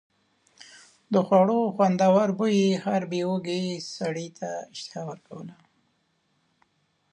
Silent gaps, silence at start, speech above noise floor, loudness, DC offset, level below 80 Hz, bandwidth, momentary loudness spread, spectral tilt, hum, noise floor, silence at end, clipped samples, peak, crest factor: none; 1.1 s; 46 dB; -25 LUFS; under 0.1%; -74 dBFS; 10 kHz; 17 LU; -6.5 dB/octave; none; -71 dBFS; 1.6 s; under 0.1%; -6 dBFS; 20 dB